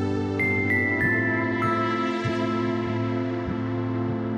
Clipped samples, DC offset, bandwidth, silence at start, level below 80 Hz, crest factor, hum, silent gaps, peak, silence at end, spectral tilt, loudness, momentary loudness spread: under 0.1%; under 0.1%; 14.5 kHz; 0 s; -52 dBFS; 14 dB; none; none; -10 dBFS; 0 s; -7.5 dB/octave; -24 LUFS; 6 LU